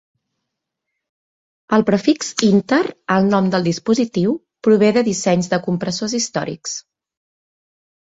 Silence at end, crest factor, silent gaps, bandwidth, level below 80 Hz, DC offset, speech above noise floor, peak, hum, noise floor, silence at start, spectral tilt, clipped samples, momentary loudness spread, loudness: 1.2 s; 18 dB; none; 8 kHz; -58 dBFS; under 0.1%; 62 dB; 0 dBFS; none; -79 dBFS; 1.7 s; -5 dB/octave; under 0.1%; 7 LU; -18 LUFS